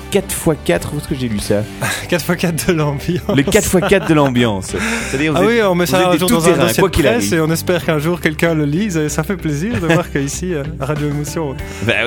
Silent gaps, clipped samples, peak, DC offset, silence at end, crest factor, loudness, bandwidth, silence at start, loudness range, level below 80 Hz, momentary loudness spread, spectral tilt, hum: none; under 0.1%; 0 dBFS; under 0.1%; 0 s; 14 dB; -15 LUFS; 19 kHz; 0 s; 4 LU; -34 dBFS; 8 LU; -5 dB/octave; none